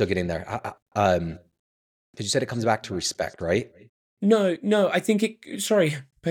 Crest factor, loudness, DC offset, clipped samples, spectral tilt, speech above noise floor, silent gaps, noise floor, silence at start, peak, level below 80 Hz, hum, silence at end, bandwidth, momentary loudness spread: 18 dB; -25 LUFS; under 0.1%; under 0.1%; -5 dB/octave; over 66 dB; 0.82-0.86 s, 1.59-2.13 s, 3.89-4.17 s; under -90 dBFS; 0 s; -6 dBFS; -54 dBFS; none; 0 s; 18 kHz; 11 LU